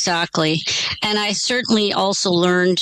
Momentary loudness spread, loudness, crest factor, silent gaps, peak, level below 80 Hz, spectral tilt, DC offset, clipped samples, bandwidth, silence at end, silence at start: 3 LU; -18 LUFS; 12 dB; none; -6 dBFS; -54 dBFS; -3.5 dB/octave; under 0.1%; under 0.1%; 13 kHz; 0 s; 0 s